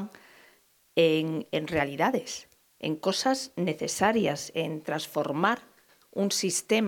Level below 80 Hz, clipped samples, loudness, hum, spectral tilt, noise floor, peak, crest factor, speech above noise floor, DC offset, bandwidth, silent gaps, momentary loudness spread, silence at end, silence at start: -66 dBFS; under 0.1%; -28 LUFS; none; -4 dB/octave; -63 dBFS; -8 dBFS; 20 dB; 35 dB; under 0.1%; 19 kHz; none; 10 LU; 0 s; 0 s